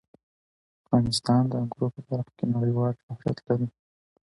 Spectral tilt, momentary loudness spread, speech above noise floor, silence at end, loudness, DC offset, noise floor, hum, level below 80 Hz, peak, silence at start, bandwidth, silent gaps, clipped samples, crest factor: -7 dB/octave; 9 LU; over 64 dB; 0.6 s; -27 LUFS; under 0.1%; under -90 dBFS; none; -56 dBFS; -10 dBFS; 0.9 s; 11.5 kHz; 3.03-3.08 s; under 0.1%; 18 dB